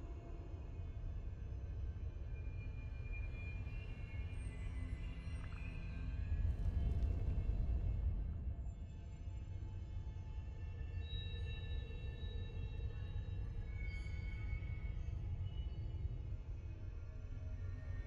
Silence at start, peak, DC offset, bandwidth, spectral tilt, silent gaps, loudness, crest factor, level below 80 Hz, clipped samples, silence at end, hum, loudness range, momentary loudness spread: 0 s; -28 dBFS; under 0.1%; 9.2 kHz; -7.5 dB/octave; none; -46 LUFS; 16 dB; -44 dBFS; under 0.1%; 0 s; none; 6 LU; 9 LU